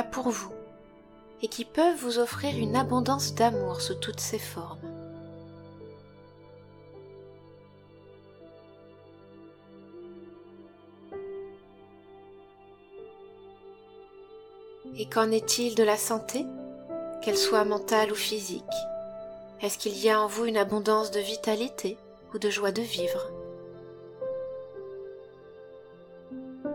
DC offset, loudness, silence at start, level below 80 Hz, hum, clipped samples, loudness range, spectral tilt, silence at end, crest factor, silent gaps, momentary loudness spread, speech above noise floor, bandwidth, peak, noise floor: under 0.1%; -29 LUFS; 0 s; -68 dBFS; none; under 0.1%; 22 LU; -3.5 dB/octave; 0 s; 22 dB; none; 25 LU; 26 dB; 18 kHz; -10 dBFS; -54 dBFS